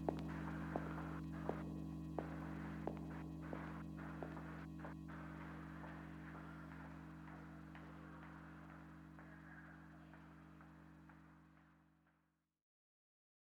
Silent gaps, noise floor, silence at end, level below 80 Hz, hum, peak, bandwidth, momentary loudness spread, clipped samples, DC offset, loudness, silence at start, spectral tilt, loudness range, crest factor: none; -84 dBFS; 1.3 s; -62 dBFS; none; -24 dBFS; 14.5 kHz; 14 LU; under 0.1%; under 0.1%; -51 LUFS; 0 s; -8 dB/octave; 14 LU; 28 dB